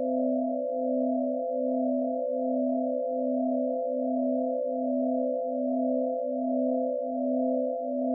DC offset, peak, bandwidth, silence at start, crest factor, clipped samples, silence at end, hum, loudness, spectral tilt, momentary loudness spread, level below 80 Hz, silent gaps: under 0.1%; -18 dBFS; 0.8 kHz; 0 s; 10 dB; under 0.1%; 0 s; none; -29 LUFS; 5 dB/octave; 2 LU; under -90 dBFS; none